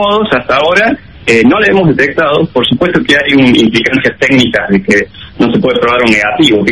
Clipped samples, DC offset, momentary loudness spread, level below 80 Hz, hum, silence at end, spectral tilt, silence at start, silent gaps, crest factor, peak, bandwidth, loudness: 0.3%; 0.7%; 4 LU; -38 dBFS; none; 0 s; -5.5 dB/octave; 0 s; none; 8 dB; 0 dBFS; 11.5 kHz; -8 LUFS